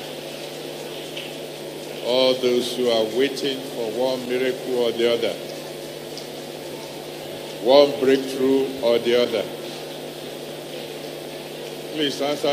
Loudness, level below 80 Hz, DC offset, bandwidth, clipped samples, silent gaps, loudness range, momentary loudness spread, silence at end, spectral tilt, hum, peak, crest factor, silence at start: -24 LUFS; -66 dBFS; under 0.1%; 15 kHz; under 0.1%; none; 6 LU; 14 LU; 0 s; -4 dB/octave; none; -2 dBFS; 22 dB; 0 s